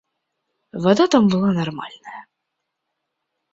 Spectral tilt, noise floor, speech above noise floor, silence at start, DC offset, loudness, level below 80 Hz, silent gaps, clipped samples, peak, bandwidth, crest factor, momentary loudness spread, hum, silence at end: -6.5 dB/octave; -78 dBFS; 60 dB; 0.75 s; under 0.1%; -18 LUFS; -60 dBFS; none; under 0.1%; -2 dBFS; 7.8 kHz; 20 dB; 22 LU; none; 1.3 s